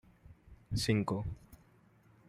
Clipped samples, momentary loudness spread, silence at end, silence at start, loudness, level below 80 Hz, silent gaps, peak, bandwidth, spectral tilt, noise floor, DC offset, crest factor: under 0.1%; 13 LU; 0.75 s; 0.3 s; -35 LUFS; -56 dBFS; none; -18 dBFS; 15 kHz; -5.5 dB/octave; -65 dBFS; under 0.1%; 20 dB